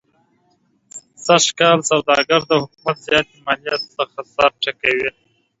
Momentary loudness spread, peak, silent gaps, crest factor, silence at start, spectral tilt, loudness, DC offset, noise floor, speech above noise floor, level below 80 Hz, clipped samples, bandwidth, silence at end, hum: 12 LU; 0 dBFS; none; 18 dB; 0.95 s; -2.5 dB/octave; -17 LUFS; under 0.1%; -62 dBFS; 44 dB; -56 dBFS; under 0.1%; 8 kHz; 0.5 s; none